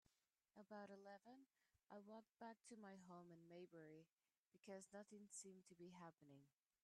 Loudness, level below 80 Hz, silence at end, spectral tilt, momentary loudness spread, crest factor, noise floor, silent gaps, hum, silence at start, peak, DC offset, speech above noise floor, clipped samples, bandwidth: -63 LUFS; under -90 dBFS; 0.35 s; -4.5 dB/octave; 6 LU; 16 dB; -88 dBFS; 4.13-4.17 s, 4.39-4.45 s; none; 0.55 s; -48 dBFS; under 0.1%; 25 dB; under 0.1%; 11 kHz